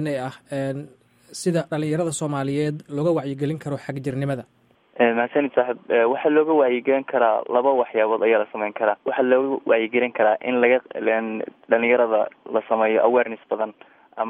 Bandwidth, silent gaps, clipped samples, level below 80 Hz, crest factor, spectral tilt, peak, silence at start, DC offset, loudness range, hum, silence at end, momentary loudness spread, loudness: 12 kHz; none; under 0.1%; -70 dBFS; 18 dB; -6 dB/octave; -4 dBFS; 0 s; under 0.1%; 5 LU; none; 0 s; 10 LU; -22 LUFS